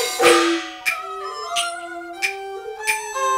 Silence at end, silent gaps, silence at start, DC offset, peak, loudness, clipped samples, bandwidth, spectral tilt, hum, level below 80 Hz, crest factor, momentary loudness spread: 0 s; none; 0 s; under 0.1%; -2 dBFS; -21 LUFS; under 0.1%; 16 kHz; -0.5 dB/octave; none; -62 dBFS; 18 dB; 17 LU